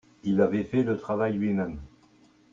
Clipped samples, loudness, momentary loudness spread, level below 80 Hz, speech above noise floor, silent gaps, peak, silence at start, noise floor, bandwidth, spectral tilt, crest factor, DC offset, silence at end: under 0.1%; -27 LUFS; 7 LU; -54 dBFS; 33 dB; none; -10 dBFS; 0.25 s; -59 dBFS; 7.4 kHz; -9 dB/octave; 18 dB; under 0.1%; 0.65 s